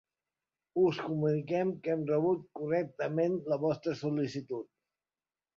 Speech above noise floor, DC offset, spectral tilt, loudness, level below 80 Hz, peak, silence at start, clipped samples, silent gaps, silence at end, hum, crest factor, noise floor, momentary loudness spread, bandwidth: over 58 dB; under 0.1%; -8 dB/octave; -32 LUFS; -74 dBFS; -18 dBFS; 0.75 s; under 0.1%; none; 0.9 s; none; 16 dB; under -90 dBFS; 8 LU; 7.2 kHz